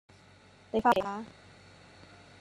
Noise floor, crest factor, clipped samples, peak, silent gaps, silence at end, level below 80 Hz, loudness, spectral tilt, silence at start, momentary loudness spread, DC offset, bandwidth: -58 dBFS; 22 dB; under 0.1%; -12 dBFS; none; 1.1 s; -64 dBFS; -30 LUFS; -5.5 dB/octave; 0.75 s; 27 LU; under 0.1%; 12.5 kHz